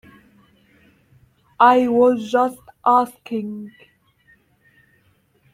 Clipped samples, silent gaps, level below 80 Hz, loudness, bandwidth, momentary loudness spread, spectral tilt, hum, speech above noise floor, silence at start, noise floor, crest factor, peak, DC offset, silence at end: under 0.1%; none; -64 dBFS; -18 LUFS; 15 kHz; 17 LU; -5.5 dB/octave; none; 43 dB; 1.6 s; -61 dBFS; 20 dB; -2 dBFS; under 0.1%; 1.85 s